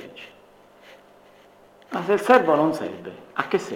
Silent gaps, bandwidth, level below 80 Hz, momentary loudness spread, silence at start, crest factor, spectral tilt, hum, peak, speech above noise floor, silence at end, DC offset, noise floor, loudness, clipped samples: none; 16.5 kHz; -70 dBFS; 22 LU; 0 s; 22 dB; -5.5 dB/octave; 50 Hz at -55 dBFS; -4 dBFS; 31 dB; 0 s; under 0.1%; -52 dBFS; -22 LUFS; under 0.1%